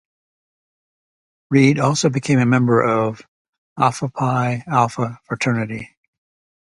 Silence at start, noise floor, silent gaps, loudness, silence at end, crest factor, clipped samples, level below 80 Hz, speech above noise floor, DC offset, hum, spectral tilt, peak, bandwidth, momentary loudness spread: 1.5 s; under -90 dBFS; 3.28-3.45 s, 3.58-3.76 s; -18 LUFS; 0.8 s; 20 dB; under 0.1%; -58 dBFS; over 72 dB; under 0.1%; none; -6 dB/octave; 0 dBFS; 11.5 kHz; 10 LU